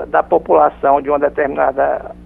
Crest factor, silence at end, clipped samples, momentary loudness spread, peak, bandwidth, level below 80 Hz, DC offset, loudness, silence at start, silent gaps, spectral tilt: 14 dB; 0.15 s; under 0.1%; 5 LU; 0 dBFS; 3.8 kHz; -42 dBFS; under 0.1%; -15 LUFS; 0 s; none; -9 dB/octave